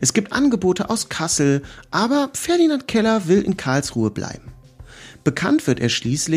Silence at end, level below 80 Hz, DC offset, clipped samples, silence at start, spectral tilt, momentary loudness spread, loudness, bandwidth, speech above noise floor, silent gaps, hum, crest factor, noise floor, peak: 0 s; -48 dBFS; under 0.1%; under 0.1%; 0 s; -4.5 dB/octave; 6 LU; -19 LUFS; 15.5 kHz; 23 dB; none; none; 18 dB; -42 dBFS; -2 dBFS